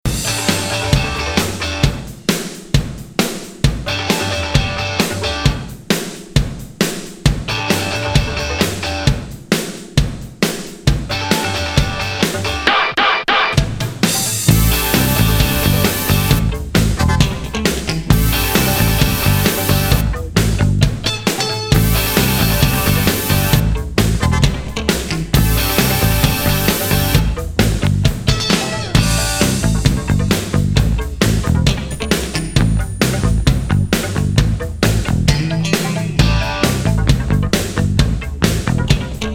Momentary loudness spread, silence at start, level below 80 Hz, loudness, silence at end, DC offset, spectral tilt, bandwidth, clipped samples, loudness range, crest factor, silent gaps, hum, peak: 6 LU; 0.05 s; -22 dBFS; -16 LUFS; 0 s; under 0.1%; -4.5 dB/octave; 18 kHz; under 0.1%; 4 LU; 16 dB; none; none; 0 dBFS